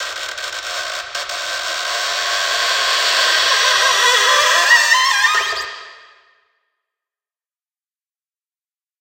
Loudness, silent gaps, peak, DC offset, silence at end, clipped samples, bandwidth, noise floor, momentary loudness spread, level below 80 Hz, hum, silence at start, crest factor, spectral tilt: -14 LUFS; none; 0 dBFS; under 0.1%; 3.05 s; under 0.1%; 16 kHz; under -90 dBFS; 13 LU; -60 dBFS; none; 0 s; 18 dB; 3 dB/octave